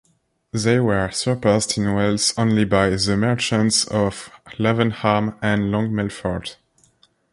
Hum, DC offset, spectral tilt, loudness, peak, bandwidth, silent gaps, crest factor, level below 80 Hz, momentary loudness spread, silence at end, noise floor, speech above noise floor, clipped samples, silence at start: none; under 0.1%; -4.5 dB/octave; -20 LUFS; -2 dBFS; 11.5 kHz; none; 18 dB; -44 dBFS; 9 LU; 0.8 s; -59 dBFS; 39 dB; under 0.1%; 0.55 s